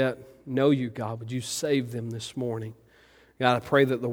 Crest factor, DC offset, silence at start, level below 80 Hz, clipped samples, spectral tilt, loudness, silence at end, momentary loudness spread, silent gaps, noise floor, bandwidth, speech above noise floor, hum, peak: 22 dB; under 0.1%; 0 s; -64 dBFS; under 0.1%; -5.5 dB/octave; -27 LUFS; 0 s; 12 LU; none; -58 dBFS; over 20 kHz; 31 dB; none; -6 dBFS